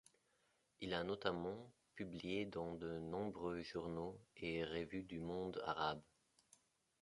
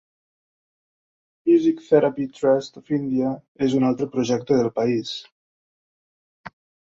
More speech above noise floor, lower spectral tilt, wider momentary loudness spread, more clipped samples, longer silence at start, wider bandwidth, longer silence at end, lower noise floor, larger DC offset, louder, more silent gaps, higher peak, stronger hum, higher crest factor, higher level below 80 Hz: second, 35 dB vs over 69 dB; about the same, -6 dB/octave vs -6.5 dB/octave; about the same, 9 LU vs 8 LU; neither; second, 0.8 s vs 1.45 s; first, 11.5 kHz vs 7.8 kHz; first, 1 s vs 0.4 s; second, -81 dBFS vs under -90 dBFS; neither; second, -46 LUFS vs -22 LUFS; second, none vs 3.48-3.55 s, 5.32-6.44 s; second, -24 dBFS vs -4 dBFS; neither; about the same, 24 dB vs 20 dB; second, -70 dBFS vs -62 dBFS